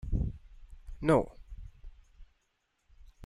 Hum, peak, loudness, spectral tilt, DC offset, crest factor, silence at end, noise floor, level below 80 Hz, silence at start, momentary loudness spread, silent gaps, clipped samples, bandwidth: none; -12 dBFS; -31 LUFS; -8 dB/octave; under 0.1%; 22 dB; 0 s; -78 dBFS; -42 dBFS; 0.05 s; 26 LU; none; under 0.1%; 12.5 kHz